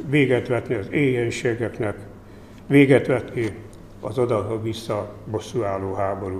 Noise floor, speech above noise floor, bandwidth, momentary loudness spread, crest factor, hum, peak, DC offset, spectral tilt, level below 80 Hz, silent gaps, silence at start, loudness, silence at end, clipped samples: -43 dBFS; 21 dB; 13 kHz; 13 LU; 20 dB; none; -2 dBFS; 0.1%; -7 dB/octave; -50 dBFS; none; 0 s; -22 LUFS; 0 s; under 0.1%